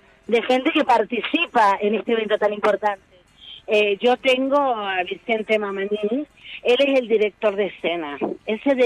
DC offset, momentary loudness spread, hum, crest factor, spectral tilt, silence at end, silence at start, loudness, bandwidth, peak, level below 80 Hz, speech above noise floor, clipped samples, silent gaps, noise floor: under 0.1%; 8 LU; none; 14 dB; -5 dB/octave; 0 s; 0.3 s; -21 LUFS; 11.5 kHz; -8 dBFS; -62 dBFS; 24 dB; under 0.1%; none; -44 dBFS